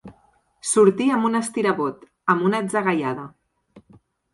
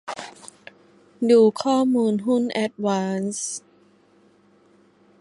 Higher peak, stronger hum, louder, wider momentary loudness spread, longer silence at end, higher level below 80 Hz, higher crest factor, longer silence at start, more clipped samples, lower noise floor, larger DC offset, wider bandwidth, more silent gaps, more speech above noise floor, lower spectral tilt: about the same, -4 dBFS vs -6 dBFS; neither; about the same, -21 LUFS vs -21 LUFS; second, 12 LU vs 19 LU; second, 0.55 s vs 1.6 s; first, -66 dBFS vs -72 dBFS; about the same, 20 dB vs 18 dB; about the same, 0.05 s vs 0.05 s; neither; about the same, -60 dBFS vs -57 dBFS; neither; about the same, 11.5 kHz vs 11.5 kHz; neither; about the same, 40 dB vs 37 dB; about the same, -5 dB/octave vs -5 dB/octave